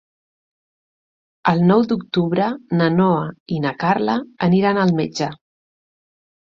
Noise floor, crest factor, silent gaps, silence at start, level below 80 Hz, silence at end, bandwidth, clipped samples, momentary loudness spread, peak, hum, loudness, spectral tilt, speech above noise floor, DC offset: under -90 dBFS; 18 dB; 3.40-3.46 s; 1.45 s; -58 dBFS; 1.1 s; 7.4 kHz; under 0.1%; 8 LU; -2 dBFS; none; -19 LUFS; -7.5 dB/octave; over 72 dB; under 0.1%